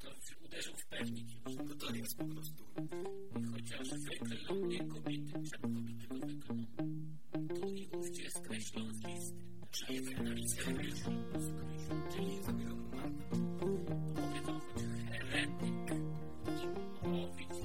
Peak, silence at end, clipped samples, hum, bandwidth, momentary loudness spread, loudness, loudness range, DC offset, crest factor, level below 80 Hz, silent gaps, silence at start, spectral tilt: -22 dBFS; 0 s; under 0.1%; none; 16.5 kHz; 7 LU; -43 LUFS; 4 LU; 0.7%; 18 dB; -60 dBFS; none; 0 s; -5 dB/octave